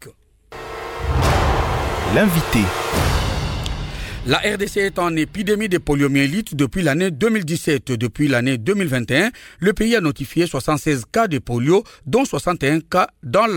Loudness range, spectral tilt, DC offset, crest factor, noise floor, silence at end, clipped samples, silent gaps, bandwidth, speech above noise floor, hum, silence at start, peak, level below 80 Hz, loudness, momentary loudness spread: 1 LU; -5.5 dB/octave; under 0.1%; 16 dB; -45 dBFS; 0 s; under 0.1%; none; 17.5 kHz; 27 dB; none; 0 s; -2 dBFS; -30 dBFS; -19 LUFS; 6 LU